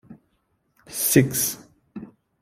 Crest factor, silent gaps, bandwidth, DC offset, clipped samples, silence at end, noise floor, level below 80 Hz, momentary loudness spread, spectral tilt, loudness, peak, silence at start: 24 dB; none; 16 kHz; under 0.1%; under 0.1%; 0.35 s; -70 dBFS; -56 dBFS; 23 LU; -4 dB/octave; -21 LUFS; -2 dBFS; 0.1 s